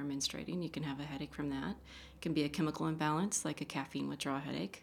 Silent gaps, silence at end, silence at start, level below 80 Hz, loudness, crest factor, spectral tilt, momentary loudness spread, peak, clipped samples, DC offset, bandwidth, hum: none; 0 s; 0 s; -62 dBFS; -38 LUFS; 18 dB; -4.5 dB/octave; 8 LU; -20 dBFS; under 0.1%; under 0.1%; 17 kHz; none